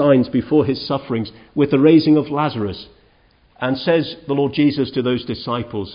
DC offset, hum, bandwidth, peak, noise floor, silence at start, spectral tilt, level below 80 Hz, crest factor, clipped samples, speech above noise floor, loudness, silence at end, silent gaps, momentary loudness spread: under 0.1%; none; 5.4 kHz; -2 dBFS; -55 dBFS; 0 s; -12 dB/octave; -48 dBFS; 16 dB; under 0.1%; 37 dB; -18 LUFS; 0 s; none; 12 LU